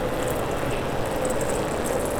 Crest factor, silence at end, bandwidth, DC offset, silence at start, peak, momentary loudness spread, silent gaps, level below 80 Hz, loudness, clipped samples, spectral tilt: 12 dB; 0 s; over 20 kHz; under 0.1%; 0 s; -12 dBFS; 2 LU; none; -38 dBFS; -26 LUFS; under 0.1%; -4.5 dB/octave